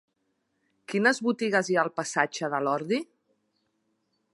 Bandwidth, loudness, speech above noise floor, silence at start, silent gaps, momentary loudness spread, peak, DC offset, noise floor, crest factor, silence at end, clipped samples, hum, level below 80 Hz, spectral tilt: 11.5 kHz; -27 LUFS; 50 dB; 0.9 s; none; 7 LU; -8 dBFS; under 0.1%; -76 dBFS; 22 dB; 1.3 s; under 0.1%; none; -82 dBFS; -4 dB/octave